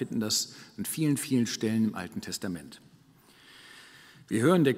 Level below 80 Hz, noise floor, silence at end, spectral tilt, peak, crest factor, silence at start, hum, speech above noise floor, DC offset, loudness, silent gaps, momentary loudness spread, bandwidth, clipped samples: -70 dBFS; -59 dBFS; 0 s; -4.5 dB/octave; -12 dBFS; 18 dB; 0 s; none; 30 dB; under 0.1%; -29 LUFS; none; 23 LU; 16 kHz; under 0.1%